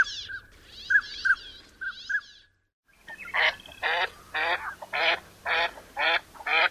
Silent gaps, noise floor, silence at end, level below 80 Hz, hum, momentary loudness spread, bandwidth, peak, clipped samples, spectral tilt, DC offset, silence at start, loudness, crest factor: 2.73-2.83 s; -55 dBFS; 0 s; -60 dBFS; none; 15 LU; 15.5 kHz; -10 dBFS; under 0.1%; -1 dB/octave; under 0.1%; 0 s; -27 LUFS; 20 dB